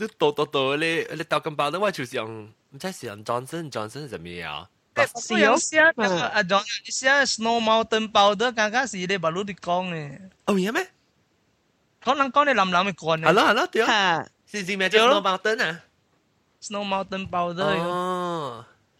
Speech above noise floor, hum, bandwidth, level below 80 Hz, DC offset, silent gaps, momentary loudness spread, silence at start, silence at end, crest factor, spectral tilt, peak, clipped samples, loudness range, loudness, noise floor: 44 dB; none; 15.5 kHz; -64 dBFS; under 0.1%; none; 16 LU; 0 s; 0.35 s; 22 dB; -3.5 dB/octave; -2 dBFS; under 0.1%; 8 LU; -23 LUFS; -67 dBFS